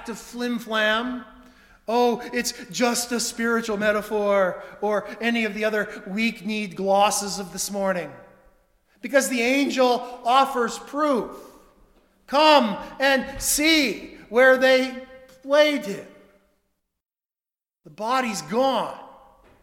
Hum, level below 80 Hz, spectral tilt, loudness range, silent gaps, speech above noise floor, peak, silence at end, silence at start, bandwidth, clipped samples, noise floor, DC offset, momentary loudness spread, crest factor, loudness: none; -56 dBFS; -2.5 dB/octave; 6 LU; none; over 68 dB; -2 dBFS; 0.5 s; 0 s; 17.5 kHz; under 0.1%; under -90 dBFS; under 0.1%; 13 LU; 20 dB; -22 LUFS